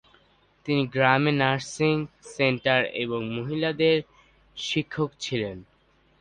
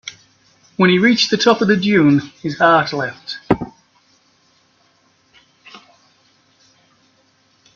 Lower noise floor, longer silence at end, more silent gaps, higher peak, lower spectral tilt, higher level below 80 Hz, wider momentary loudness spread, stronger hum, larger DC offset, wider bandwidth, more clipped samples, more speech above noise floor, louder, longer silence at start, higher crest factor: first, -63 dBFS vs -58 dBFS; second, 0.55 s vs 2 s; neither; second, -4 dBFS vs 0 dBFS; about the same, -5.5 dB/octave vs -5 dB/octave; second, -60 dBFS vs -52 dBFS; second, 13 LU vs 16 LU; neither; neither; first, 10 kHz vs 7.2 kHz; neither; second, 38 dB vs 43 dB; second, -25 LUFS vs -15 LUFS; first, 0.65 s vs 0.05 s; about the same, 22 dB vs 18 dB